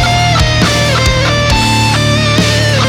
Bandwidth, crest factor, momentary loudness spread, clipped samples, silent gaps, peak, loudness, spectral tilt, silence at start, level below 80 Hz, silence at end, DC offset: 16 kHz; 8 dB; 1 LU; under 0.1%; none; -2 dBFS; -10 LUFS; -4 dB/octave; 0 s; -20 dBFS; 0 s; under 0.1%